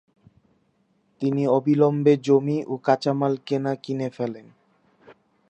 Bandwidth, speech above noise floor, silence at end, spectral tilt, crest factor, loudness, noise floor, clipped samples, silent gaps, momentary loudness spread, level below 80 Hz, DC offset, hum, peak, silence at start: 8.4 kHz; 45 dB; 0.35 s; -8 dB/octave; 20 dB; -23 LUFS; -66 dBFS; under 0.1%; none; 11 LU; -74 dBFS; under 0.1%; none; -4 dBFS; 1.2 s